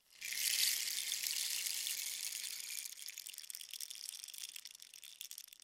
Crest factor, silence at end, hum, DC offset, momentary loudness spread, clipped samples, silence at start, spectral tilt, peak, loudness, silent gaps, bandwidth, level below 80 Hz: 26 dB; 0.1 s; none; under 0.1%; 16 LU; under 0.1%; 0.1 s; 5 dB/octave; -16 dBFS; -39 LUFS; none; 17 kHz; under -90 dBFS